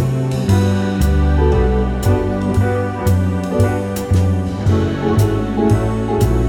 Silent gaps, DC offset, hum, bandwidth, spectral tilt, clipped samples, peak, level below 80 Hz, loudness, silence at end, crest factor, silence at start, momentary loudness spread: none; under 0.1%; none; 17.5 kHz; -7.5 dB/octave; under 0.1%; -2 dBFS; -24 dBFS; -16 LUFS; 0 s; 12 dB; 0 s; 3 LU